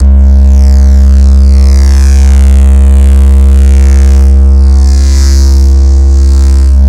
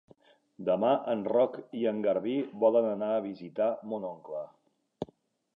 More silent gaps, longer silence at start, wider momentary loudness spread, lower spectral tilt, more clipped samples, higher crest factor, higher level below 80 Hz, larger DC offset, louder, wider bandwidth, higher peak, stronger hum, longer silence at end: neither; second, 0 s vs 0.6 s; second, 1 LU vs 16 LU; second, -7 dB/octave vs -9 dB/octave; first, 10% vs under 0.1%; second, 2 dB vs 18 dB; first, -2 dBFS vs -76 dBFS; neither; first, -5 LUFS vs -30 LUFS; first, 9.8 kHz vs 5.2 kHz; first, 0 dBFS vs -12 dBFS; neither; second, 0 s vs 0.5 s